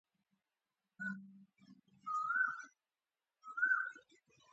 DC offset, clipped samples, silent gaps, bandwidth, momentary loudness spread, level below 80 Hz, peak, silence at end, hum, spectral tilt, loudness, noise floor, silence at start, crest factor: under 0.1%; under 0.1%; none; 8 kHz; 22 LU; under -90 dBFS; -24 dBFS; 0.5 s; none; -2.5 dB/octave; -39 LUFS; under -90 dBFS; 1 s; 20 dB